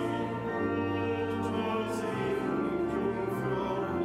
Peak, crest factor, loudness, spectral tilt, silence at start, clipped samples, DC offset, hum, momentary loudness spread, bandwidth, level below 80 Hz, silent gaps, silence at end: -20 dBFS; 12 dB; -32 LUFS; -7 dB/octave; 0 s; under 0.1%; under 0.1%; none; 2 LU; 15 kHz; -56 dBFS; none; 0 s